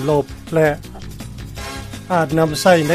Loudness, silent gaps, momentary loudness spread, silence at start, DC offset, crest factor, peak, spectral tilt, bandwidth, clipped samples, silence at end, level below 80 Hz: -18 LUFS; none; 18 LU; 0 s; under 0.1%; 18 dB; 0 dBFS; -5.5 dB/octave; 15.5 kHz; under 0.1%; 0 s; -38 dBFS